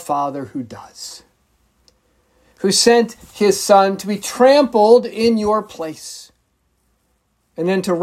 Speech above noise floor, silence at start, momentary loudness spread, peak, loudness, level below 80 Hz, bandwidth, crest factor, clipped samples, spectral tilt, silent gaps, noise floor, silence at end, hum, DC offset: 49 dB; 0 s; 20 LU; 0 dBFS; -15 LUFS; -56 dBFS; 15.5 kHz; 18 dB; under 0.1%; -4 dB/octave; none; -65 dBFS; 0 s; none; under 0.1%